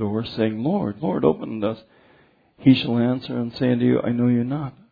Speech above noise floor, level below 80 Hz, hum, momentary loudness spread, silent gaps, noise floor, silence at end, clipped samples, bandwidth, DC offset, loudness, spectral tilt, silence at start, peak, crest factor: 35 dB; -56 dBFS; none; 9 LU; none; -57 dBFS; 0.2 s; under 0.1%; 5 kHz; under 0.1%; -22 LUFS; -9.5 dB/octave; 0 s; -4 dBFS; 18 dB